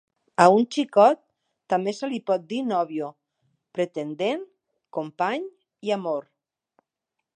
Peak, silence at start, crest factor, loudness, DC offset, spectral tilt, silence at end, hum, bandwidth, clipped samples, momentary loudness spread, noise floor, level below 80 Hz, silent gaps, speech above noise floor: -2 dBFS; 0.4 s; 24 dB; -24 LUFS; under 0.1%; -5.5 dB/octave; 1.15 s; none; 9.6 kHz; under 0.1%; 15 LU; -84 dBFS; -78 dBFS; none; 61 dB